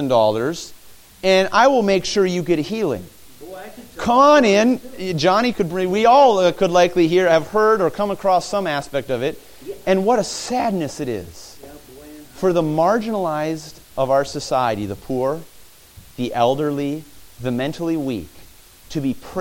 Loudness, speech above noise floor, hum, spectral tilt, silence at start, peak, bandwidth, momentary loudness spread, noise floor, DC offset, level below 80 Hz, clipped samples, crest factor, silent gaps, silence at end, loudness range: -18 LUFS; 28 dB; none; -5 dB/octave; 0 s; -2 dBFS; 17 kHz; 16 LU; -46 dBFS; under 0.1%; -50 dBFS; under 0.1%; 18 dB; none; 0 s; 8 LU